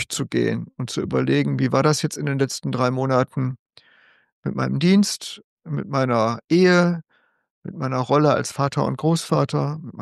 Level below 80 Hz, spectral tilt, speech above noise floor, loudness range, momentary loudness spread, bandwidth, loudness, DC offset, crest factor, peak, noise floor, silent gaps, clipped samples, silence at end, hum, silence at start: -60 dBFS; -6 dB/octave; 36 dB; 3 LU; 12 LU; 12.5 kHz; -21 LUFS; under 0.1%; 18 dB; -4 dBFS; -56 dBFS; 3.59-3.66 s, 4.32-4.43 s, 5.44-5.57 s, 7.50-7.62 s; under 0.1%; 0 s; none; 0 s